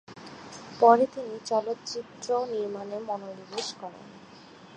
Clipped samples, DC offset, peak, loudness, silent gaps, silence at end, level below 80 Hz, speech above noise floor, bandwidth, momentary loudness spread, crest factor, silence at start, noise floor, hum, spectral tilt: under 0.1%; under 0.1%; -4 dBFS; -28 LUFS; none; 0 s; -74 dBFS; 22 dB; 9.6 kHz; 23 LU; 24 dB; 0.1 s; -50 dBFS; none; -4 dB/octave